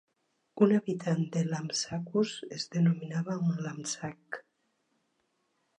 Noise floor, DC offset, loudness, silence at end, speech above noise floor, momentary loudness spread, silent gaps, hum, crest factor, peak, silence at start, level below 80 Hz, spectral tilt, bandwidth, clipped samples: -77 dBFS; under 0.1%; -31 LUFS; 1.4 s; 47 dB; 14 LU; none; none; 22 dB; -10 dBFS; 0.55 s; -74 dBFS; -5.5 dB/octave; 10.5 kHz; under 0.1%